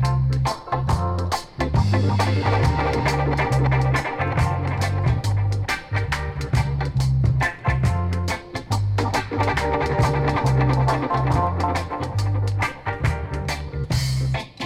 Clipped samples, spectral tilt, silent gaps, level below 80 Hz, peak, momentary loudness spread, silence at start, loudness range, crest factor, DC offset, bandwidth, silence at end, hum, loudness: under 0.1%; -6.5 dB/octave; none; -32 dBFS; -6 dBFS; 6 LU; 0 s; 2 LU; 14 dB; under 0.1%; 14.5 kHz; 0 s; none; -22 LUFS